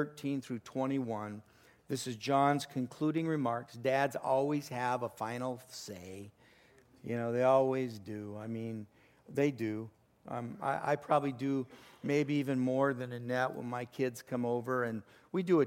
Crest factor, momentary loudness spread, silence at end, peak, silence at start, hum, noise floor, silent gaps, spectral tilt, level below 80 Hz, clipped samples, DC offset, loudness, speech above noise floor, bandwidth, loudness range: 20 dB; 14 LU; 0 s; -14 dBFS; 0 s; none; -63 dBFS; none; -6.5 dB/octave; -78 dBFS; under 0.1%; under 0.1%; -35 LUFS; 29 dB; 16.5 kHz; 3 LU